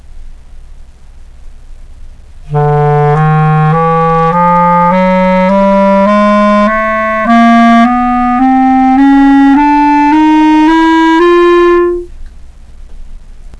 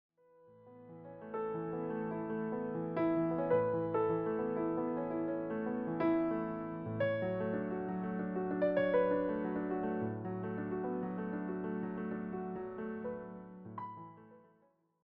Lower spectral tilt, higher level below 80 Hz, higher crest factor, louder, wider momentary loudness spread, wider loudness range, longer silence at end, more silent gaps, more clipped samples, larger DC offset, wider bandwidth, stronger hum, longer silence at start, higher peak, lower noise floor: about the same, -8 dB/octave vs -7.5 dB/octave; first, -28 dBFS vs -68 dBFS; second, 8 dB vs 16 dB; first, -7 LUFS vs -37 LUFS; second, 4 LU vs 14 LU; about the same, 5 LU vs 6 LU; second, 0.1 s vs 0.65 s; neither; neither; neither; first, 9.8 kHz vs 5 kHz; neither; second, 0.15 s vs 0.45 s; first, 0 dBFS vs -20 dBFS; second, -31 dBFS vs -72 dBFS